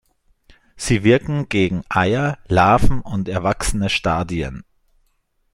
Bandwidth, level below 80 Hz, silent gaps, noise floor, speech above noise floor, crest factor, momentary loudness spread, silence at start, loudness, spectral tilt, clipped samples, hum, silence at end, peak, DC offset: 12.5 kHz; -30 dBFS; none; -65 dBFS; 47 dB; 16 dB; 10 LU; 0.75 s; -19 LUFS; -5.5 dB/octave; under 0.1%; none; 0.9 s; -2 dBFS; under 0.1%